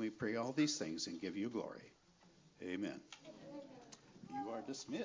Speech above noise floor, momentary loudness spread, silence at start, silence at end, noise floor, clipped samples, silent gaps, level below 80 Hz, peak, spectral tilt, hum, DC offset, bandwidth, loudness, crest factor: 25 dB; 20 LU; 0 s; 0 s; -68 dBFS; under 0.1%; none; -78 dBFS; -24 dBFS; -4 dB/octave; none; under 0.1%; 7.6 kHz; -43 LUFS; 20 dB